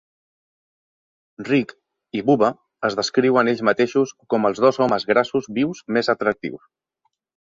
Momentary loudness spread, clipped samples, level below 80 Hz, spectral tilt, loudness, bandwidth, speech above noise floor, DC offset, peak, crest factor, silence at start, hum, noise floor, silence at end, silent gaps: 8 LU; under 0.1%; -62 dBFS; -5.5 dB/octave; -20 LUFS; 7.6 kHz; 53 dB; under 0.1%; -2 dBFS; 20 dB; 1.4 s; none; -72 dBFS; 0.9 s; none